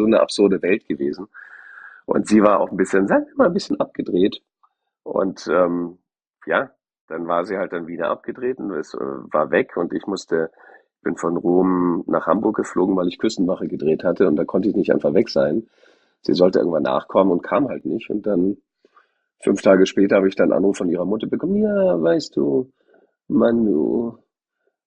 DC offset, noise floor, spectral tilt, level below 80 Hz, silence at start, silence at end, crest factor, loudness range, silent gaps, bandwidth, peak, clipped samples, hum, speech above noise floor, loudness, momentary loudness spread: under 0.1%; -73 dBFS; -6.5 dB/octave; -58 dBFS; 0 s; 0.75 s; 18 dB; 5 LU; 7.01-7.08 s; 9.8 kHz; -2 dBFS; under 0.1%; none; 54 dB; -20 LUFS; 11 LU